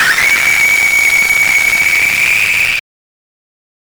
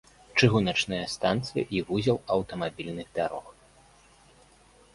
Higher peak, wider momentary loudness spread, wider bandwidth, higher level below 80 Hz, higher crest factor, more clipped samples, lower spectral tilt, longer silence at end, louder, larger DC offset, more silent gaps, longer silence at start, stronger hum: first, -2 dBFS vs -6 dBFS; second, 3 LU vs 11 LU; first, over 20 kHz vs 11.5 kHz; first, -44 dBFS vs -56 dBFS; second, 10 dB vs 24 dB; neither; second, 0.5 dB/octave vs -5.5 dB/octave; second, 1.2 s vs 1.45 s; first, -8 LUFS vs -28 LUFS; neither; neither; second, 0 s vs 0.35 s; neither